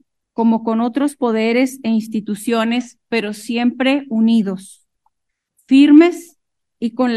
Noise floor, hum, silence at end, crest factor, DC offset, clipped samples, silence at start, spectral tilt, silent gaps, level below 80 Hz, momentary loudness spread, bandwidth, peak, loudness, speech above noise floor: -75 dBFS; none; 0 s; 16 dB; under 0.1%; under 0.1%; 0.4 s; -5.5 dB/octave; none; -66 dBFS; 14 LU; 13 kHz; 0 dBFS; -16 LUFS; 59 dB